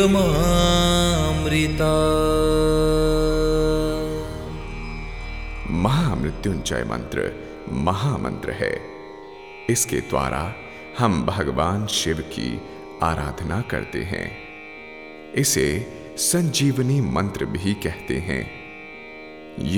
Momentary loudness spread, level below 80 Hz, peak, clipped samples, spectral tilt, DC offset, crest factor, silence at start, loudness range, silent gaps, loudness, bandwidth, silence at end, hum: 18 LU; -32 dBFS; -6 dBFS; under 0.1%; -5 dB/octave; 0.2%; 18 dB; 0 s; 6 LU; none; -22 LUFS; 20 kHz; 0 s; none